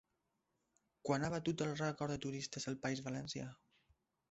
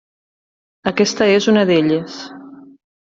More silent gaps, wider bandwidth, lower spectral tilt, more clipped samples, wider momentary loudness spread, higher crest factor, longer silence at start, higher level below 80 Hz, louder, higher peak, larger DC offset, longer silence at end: neither; about the same, 8 kHz vs 7.8 kHz; about the same, -5 dB/octave vs -5 dB/octave; neither; second, 8 LU vs 18 LU; about the same, 22 dB vs 18 dB; first, 1.05 s vs 0.85 s; second, -70 dBFS vs -58 dBFS; second, -41 LUFS vs -15 LUFS; second, -22 dBFS vs 0 dBFS; neither; first, 0.75 s vs 0.45 s